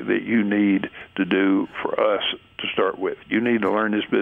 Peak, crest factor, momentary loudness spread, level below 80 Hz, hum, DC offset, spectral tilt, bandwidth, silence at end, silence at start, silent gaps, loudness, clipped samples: -6 dBFS; 16 dB; 7 LU; -62 dBFS; none; under 0.1%; -8 dB/octave; 3.9 kHz; 0 s; 0 s; none; -22 LUFS; under 0.1%